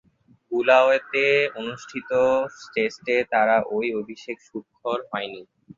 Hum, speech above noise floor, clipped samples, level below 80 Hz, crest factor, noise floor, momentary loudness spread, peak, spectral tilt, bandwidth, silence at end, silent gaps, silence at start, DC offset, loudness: none; 21 dB; under 0.1%; -66 dBFS; 20 dB; -44 dBFS; 17 LU; -4 dBFS; -4.5 dB/octave; 7.6 kHz; 0.35 s; none; 0.5 s; under 0.1%; -22 LUFS